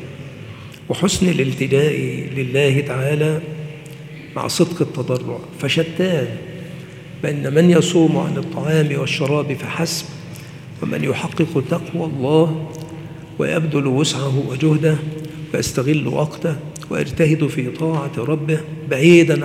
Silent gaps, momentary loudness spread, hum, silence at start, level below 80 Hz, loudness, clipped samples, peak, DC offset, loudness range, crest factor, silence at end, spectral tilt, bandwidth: none; 17 LU; none; 0 s; -52 dBFS; -18 LUFS; under 0.1%; 0 dBFS; under 0.1%; 4 LU; 18 dB; 0 s; -6 dB/octave; 15.5 kHz